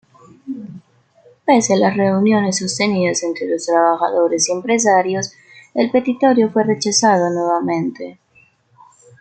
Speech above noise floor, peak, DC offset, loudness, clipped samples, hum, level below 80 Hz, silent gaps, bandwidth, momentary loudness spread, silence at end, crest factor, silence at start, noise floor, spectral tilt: 38 dB; -2 dBFS; under 0.1%; -16 LUFS; under 0.1%; none; -64 dBFS; none; 9.2 kHz; 14 LU; 1.05 s; 16 dB; 0.45 s; -54 dBFS; -4 dB/octave